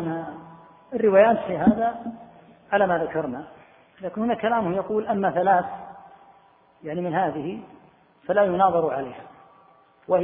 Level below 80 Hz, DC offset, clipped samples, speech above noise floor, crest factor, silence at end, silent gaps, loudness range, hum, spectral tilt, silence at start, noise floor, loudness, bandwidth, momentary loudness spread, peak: -58 dBFS; under 0.1%; under 0.1%; 34 dB; 20 dB; 0 s; none; 4 LU; none; -11 dB/octave; 0 s; -56 dBFS; -23 LUFS; 3.8 kHz; 19 LU; -4 dBFS